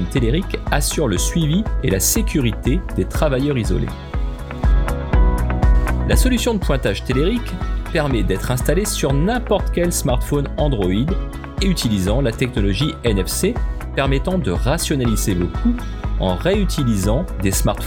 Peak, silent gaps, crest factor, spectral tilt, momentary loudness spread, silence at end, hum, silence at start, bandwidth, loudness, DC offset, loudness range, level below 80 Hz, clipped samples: -2 dBFS; none; 16 dB; -5 dB/octave; 5 LU; 0 s; none; 0 s; 19 kHz; -19 LUFS; under 0.1%; 1 LU; -22 dBFS; under 0.1%